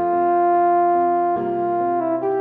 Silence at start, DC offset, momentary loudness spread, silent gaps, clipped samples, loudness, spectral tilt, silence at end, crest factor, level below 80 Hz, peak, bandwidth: 0 s; under 0.1%; 5 LU; none; under 0.1%; -19 LUFS; -10.5 dB/octave; 0 s; 10 dB; -62 dBFS; -8 dBFS; 3.3 kHz